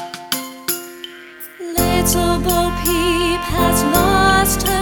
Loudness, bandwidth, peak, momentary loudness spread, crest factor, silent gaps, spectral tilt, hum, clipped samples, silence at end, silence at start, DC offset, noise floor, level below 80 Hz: -16 LUFS; over 20 kHz; 0 dBFS; 18 LU; 16 dB; none; -3.5 dB/octave; none; under 0.1%; 0 s; 0 s; under 0.1%; -36 dBFS; -28 dBFS